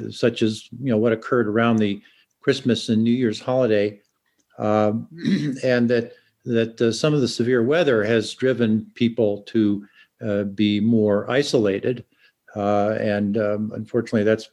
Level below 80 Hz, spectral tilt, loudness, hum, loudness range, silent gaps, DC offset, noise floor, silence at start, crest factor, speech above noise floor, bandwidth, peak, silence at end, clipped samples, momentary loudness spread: -66 dBFS; -6.5 dB/octave; -21 LUFS; none; 2 LU; none; under 0.1%; -67 dBFS; 0 s; 16 dB; 46 dB; 11.5 kHz; -4 dBFS; 0.05 s; under 0.1%; 8 LU